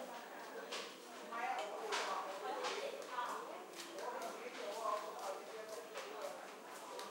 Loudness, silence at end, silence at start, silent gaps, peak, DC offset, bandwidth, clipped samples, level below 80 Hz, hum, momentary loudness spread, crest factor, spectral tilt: -45 LUFS; 0 s; 0 s; none; -28 dBFS; under 0.1%; 16 kHz; under 0.1%; under -90 dBFS; none; 8 LU; 18 dB; -1 dB/octave